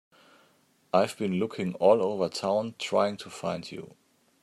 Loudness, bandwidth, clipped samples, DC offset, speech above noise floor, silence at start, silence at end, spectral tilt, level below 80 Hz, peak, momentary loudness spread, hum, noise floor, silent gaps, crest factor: -28 LUFS; 14.5 kHz; under 0.1%; under 0.1%; 38 dB; 0.95 s; 0.55 s; -5.5 dB/octave; -74 dBFS; -8 dBFS; 12 LU; none; -65 dBFS; none; 20 dB